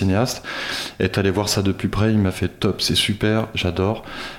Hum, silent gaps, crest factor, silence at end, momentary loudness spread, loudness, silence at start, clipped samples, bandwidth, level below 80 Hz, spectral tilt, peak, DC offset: none; none; 18 dB; 0 s; 7 LU; -21 LUFS; 0 s; under 0.1%; 16.5 kHz; -42 dBFS; -5 dB/octave; -4 dBFS; under 0.1%